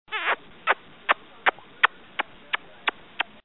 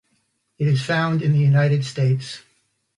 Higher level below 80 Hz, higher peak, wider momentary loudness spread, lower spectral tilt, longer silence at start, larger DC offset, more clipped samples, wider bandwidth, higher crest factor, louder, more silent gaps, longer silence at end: second, -68 dBFS vs -60 dBFS; first, -2 dBFS vs -8 dBFS; about the same, 8 LU vs 9 LU; second, -4.5 dB/octave vs -7 dB/octave; second, 0.1 s vs 0.6 s; first, 0.3% vs under 0.1%; neither; second, 4.2 kHz vs 10.5 kHz; first, 26 dB vs 14 dB; second, -27 LUFS vs -20 LUFS; neither; second, 0.25 s vs 0.6 s